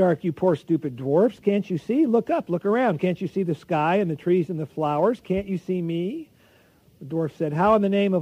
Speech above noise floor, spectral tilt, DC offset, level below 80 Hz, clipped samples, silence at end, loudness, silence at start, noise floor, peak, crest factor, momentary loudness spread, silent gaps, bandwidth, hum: 34 dB; -8.5 dB/octave; under 0.1%; -58 dBFS; under 0.1%; 0 s; -23 LUFS; 0 s; -57 dBFS; -6 dBFS; 16 dB; 7 LU; none; 10.5 kHz; none